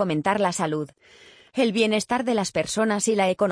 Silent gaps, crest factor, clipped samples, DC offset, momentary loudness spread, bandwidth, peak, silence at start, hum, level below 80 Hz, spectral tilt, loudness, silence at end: none; 16 dB; under 0.1%; under 0.1%; 7 LU; 10.5 kHz; -8 dBFS; 0 s; none; -62 dBFS; -4 dB/octave; -23 LUFS; 0 s